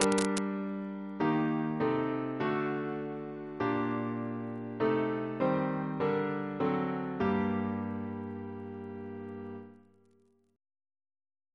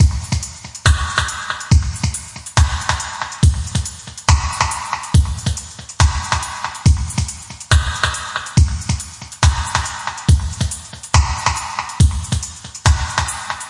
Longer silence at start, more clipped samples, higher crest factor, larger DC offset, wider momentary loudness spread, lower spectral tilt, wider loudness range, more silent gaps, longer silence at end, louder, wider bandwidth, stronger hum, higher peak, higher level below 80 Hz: about the same, 0 s vs 0 s; neither; first, 26 dB vs 16 dB; neither; first, 12 LU vs 8 LU; first, -6 dB/octave vs -3.5 dB/octave; first, 9 LU vs 1 LU; neither; first, 1.8 s vs 0 s; second, -33 LUFS vs -18 LUFS; about the same, 11 kHz vs 11.5 kHz; neither; second, -6 dBFS vs -2 dBFS; second, -68 dBFS vs -24 dBFS